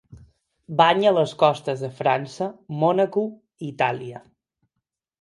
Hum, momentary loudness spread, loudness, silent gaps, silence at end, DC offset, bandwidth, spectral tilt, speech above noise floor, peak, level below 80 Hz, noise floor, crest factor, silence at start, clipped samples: none; 14 LU; -22 LUFS; none; 1 s; under 0.1%; 11.5 kHz; -6 dB/octave; 60 dB; -2 dBFS; -64 dBFS; -82 dBFS; 22 dB; 0.1 s; under 0.1%